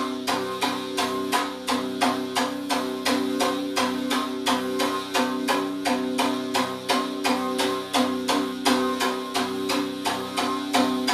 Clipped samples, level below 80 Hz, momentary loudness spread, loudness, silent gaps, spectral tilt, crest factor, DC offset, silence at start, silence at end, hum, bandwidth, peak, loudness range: under 0.1%; -66 dBFS; 3 LU; -25 LUFS; none; -2.5 dB/octave; 18 dB; under 0.1%; 0 s; 0 s; none; 14.5 kHz; -8 dBFS; 1 LU